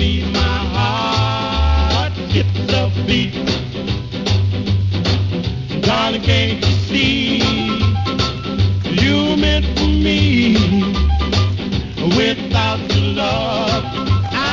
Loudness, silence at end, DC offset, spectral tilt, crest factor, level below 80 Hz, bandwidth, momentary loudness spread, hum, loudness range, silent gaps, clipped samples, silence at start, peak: -16 LUFS; 0 s; 0.2%; -6 dB/octave; 14 dB; -24 dBFS; 7.6 kHz; 5 LU; none; 3 LU; none; under 0.1%; 0 s; -2 dBFS